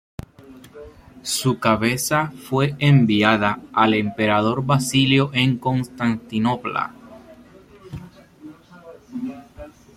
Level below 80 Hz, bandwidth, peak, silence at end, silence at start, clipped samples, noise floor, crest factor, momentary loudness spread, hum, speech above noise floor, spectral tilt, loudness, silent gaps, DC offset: -52 dBFS; 16 kHz; -2 dBFS; 0.25 s; 0.5 s; under 0.1%; -47 dBFS; 18 dB; 21 LU; none; 27 dB; -5 dB/octave; -19 LUFS; none; under 0.1%